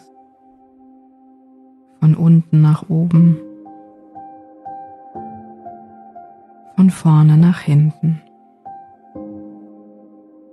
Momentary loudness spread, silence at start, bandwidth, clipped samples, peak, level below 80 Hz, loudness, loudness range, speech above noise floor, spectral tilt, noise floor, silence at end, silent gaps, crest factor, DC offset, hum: 26 LU; 2 s; 11 kHz; under 0.1%; -4 dBFS; -60 dBFS; -14 LUFS; 7 LU; 37 dB; -9.5 dB/octave; -49 dBFS; 1.05 s; none; 14 dB; under 0.1%; none